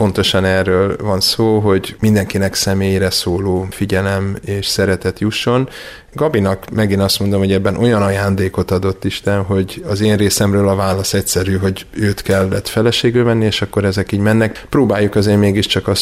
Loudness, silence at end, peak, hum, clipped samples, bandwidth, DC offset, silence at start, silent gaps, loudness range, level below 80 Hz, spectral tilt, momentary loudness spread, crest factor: -15 LUFS; 0 s; -2 dBFS; none; under 0.1%; 16 kHz; under 0.1%; 0 s; none; 2 LU; -40 dBFS; -5 dB/octave; 5 LU; 12 dB